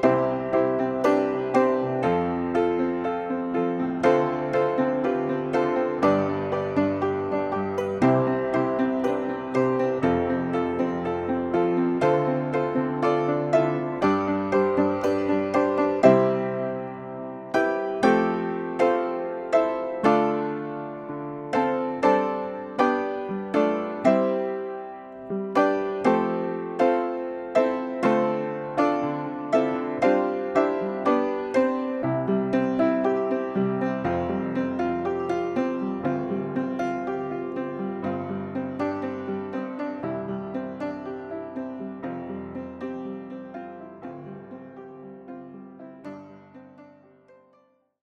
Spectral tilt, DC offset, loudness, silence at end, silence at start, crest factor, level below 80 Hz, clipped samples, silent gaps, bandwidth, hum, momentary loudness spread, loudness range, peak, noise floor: -7.5 dB/octave; under 0.1%; -25 LUFS; 1.15 s; 0 s; 20 dB; -60 dBFS; under 0.1%; none; 9.6 kHz; none; 13 LU; 11 LU; -4 dBFS; -63 dBFS